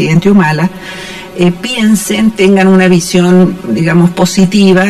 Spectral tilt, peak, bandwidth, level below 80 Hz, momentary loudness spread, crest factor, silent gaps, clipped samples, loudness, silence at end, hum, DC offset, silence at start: -6 dB/octave; 0 dBFS; 14 kHz; -40 dBFS; 9 LU; 8 dB; none; under 0.1%; -8 LUFS; 0 s; none; under 0.1%; 0 s